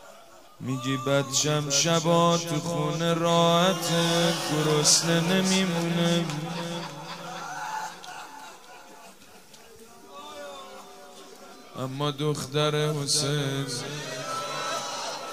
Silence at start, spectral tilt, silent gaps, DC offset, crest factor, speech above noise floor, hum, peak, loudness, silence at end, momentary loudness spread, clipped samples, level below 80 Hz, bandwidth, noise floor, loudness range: 0 s; -3.5 dB/octave; none; 0.2%; 22 dB; 26 dB; none; -6 dBFS; -25 LUFS; 0 s; 22 LU; under 0.1%; -66 dBFS; 16 kHz; -51 dBFS; 19 LU